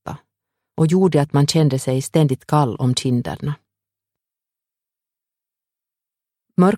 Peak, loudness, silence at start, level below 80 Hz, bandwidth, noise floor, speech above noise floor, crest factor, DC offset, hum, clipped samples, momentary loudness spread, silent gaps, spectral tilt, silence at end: -2 dBFS; -18 LUFS; 0.05 s; -56 dBFS; 14.5 kHz; -87 dBFS; 70 dB; 18 dB; under 0.1%; none; under 0.1%; 15 LU; none; -6.5 dB/octave; 0 s